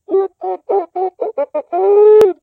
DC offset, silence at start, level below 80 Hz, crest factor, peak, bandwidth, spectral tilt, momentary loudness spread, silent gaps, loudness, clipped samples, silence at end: under 0.1%; 0.1 s; -62 dBFS; 12 dB; -2 dBFS; 5.6 kHz; -6 dB/octave; 13 LU; none; -14 LUFS; under 0.1%; 0.1 s